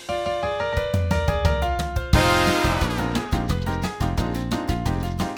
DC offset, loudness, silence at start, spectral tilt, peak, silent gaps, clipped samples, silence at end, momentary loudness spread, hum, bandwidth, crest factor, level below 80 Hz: under 0.1%; -23 LUFS; 0 s; -5.5 dB/octave; -4 dBFS; none; under 0.1%; 0 s; 7 LU; none; over 20 kHz; 20 dB; -30 dBFS